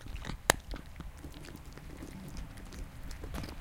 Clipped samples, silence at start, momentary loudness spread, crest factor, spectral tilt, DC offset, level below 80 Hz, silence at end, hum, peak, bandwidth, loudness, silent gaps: under 0.1%; 0 s; 18 LU; 38 dB; -3 dB/octave; under 0.1%; -46 dBFS; 0 s; none; 0 dBFS; 17 kHz; -39 LUFS; none